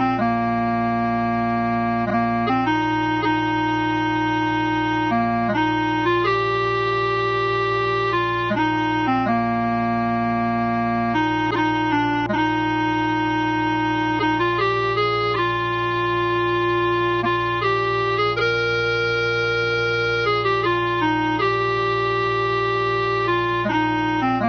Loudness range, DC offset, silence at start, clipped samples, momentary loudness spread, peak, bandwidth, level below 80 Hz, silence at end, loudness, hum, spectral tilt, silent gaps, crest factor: 1 LU; under 0.1%; 0 s; under 0.1%; 2 LU; -8 dBFS; 6.4 kHz; -46 dBFS; 0 s; -20 LUFS; none; -6.5 dB/octave; none; 12 dB